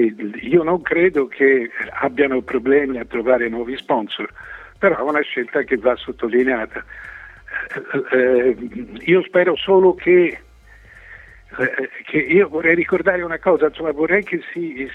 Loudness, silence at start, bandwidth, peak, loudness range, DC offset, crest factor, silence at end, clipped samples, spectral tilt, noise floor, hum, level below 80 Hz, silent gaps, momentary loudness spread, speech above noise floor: -18 LUFS; 0 s; 4.2 kHz; 0 dBFS; 4 LU; under 0.1%; 18 dB; 0 s; under 0.1%; -7.5 dB/octave; -45 dBFS; none; -50 dBFS; none; 13 LU; 27 dB